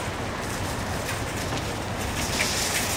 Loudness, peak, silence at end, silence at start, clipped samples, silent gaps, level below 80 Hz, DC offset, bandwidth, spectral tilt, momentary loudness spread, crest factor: -27 LUFS; -10 dBFS; 0 s; 0 s; under 0.1%; none; -40 dBFS; under 0.1%; 16 kHz; -3 dB/octave; 6 LU; 18 dB